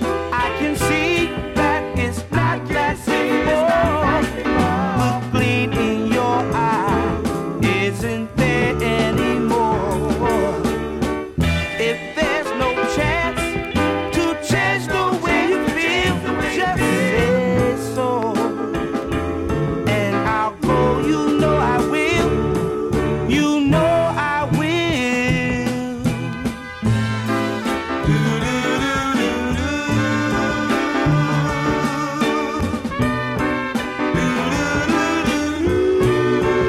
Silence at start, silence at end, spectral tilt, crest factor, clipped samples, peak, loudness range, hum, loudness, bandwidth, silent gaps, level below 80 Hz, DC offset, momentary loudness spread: 0 s; 0 s; -5.5 dB/octave; 14 dB; under 0.1%; -4 dBFS; 2 LU; none; -19 LUFS; 16 kHz; none; -34 dBFS; under 0.1%; 5 LU